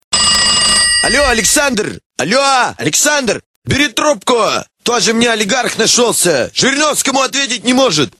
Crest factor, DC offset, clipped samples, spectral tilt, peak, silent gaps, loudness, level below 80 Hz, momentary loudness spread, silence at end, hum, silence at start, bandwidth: 12 dB; 0.1%; under 0.1%; -1.5 dB/octave; 0 dBFS; 2.06-2.10 s, 3.46-3.62 s; -11 LUFS; -38 dBFS; 8 LU; 0.1 s; none; 0.1 s; 16.5 kHz